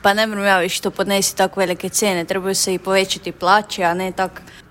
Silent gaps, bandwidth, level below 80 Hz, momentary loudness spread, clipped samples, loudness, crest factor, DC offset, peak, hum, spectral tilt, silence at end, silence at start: none; 16.5 kHz; -52 dBFS; 5 LU; under 0.1%; -18 LUFS; 18 dB; under 0.1%; 0 dBFS; none; -2.5 dB/octave; 0.1 s; 0.05 s